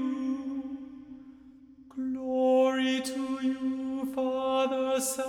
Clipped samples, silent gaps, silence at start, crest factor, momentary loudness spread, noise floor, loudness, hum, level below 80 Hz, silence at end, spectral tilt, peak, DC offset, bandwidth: under 0.1%; none; 0 s; 14 dB; 19 LU; -53 dBFS; -29 LUFS; none; -68 dBFS; 0 s; -2.5 dB/octave; -16 dBFS; under 0.1%; 18 kHz